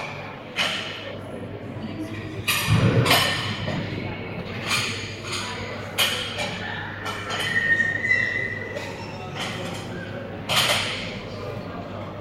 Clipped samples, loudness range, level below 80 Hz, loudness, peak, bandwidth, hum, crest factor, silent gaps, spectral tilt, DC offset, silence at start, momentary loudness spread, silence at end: under 0.1%; 4 LU; -48 dBFS; -25 LUFS; -4 dBFS; 16 kHz; none; 22 dB; none; -3.5 dB/octave; under 0.1%; 0 s; 14 LU; 0 s